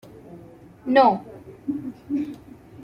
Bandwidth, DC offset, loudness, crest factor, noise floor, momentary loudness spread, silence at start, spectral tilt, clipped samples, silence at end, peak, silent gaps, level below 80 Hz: 11 kHz; under 0.1%; -23 LUFS; 22 dB; -46 dBFS; 27 LU; 0.3 s; -7 dB/octave; under 0.1%; 0 s; -4 dBFS; none; -60 dBFS